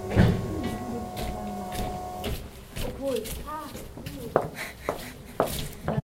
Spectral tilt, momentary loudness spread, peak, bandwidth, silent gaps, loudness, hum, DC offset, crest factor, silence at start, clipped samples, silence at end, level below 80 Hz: -6 dB/octave; 11 LU; -4 dBFS; 16.5 kHz; none; -31 LUFS; none; under 0.1%; 26 dB; 0 s; under 0.1%; 0.1 s; -40 dBFS